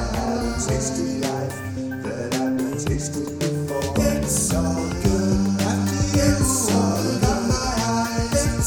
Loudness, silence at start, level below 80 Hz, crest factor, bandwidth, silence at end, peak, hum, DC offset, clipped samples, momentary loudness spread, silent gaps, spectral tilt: -22 LUFS; 0 s; -32 dBFS; 16 dB; over 20 kHz; 0 s; -4 dBFS; none; under 0.1%; under 0.1%; 7 LU; none; -5 dB/octave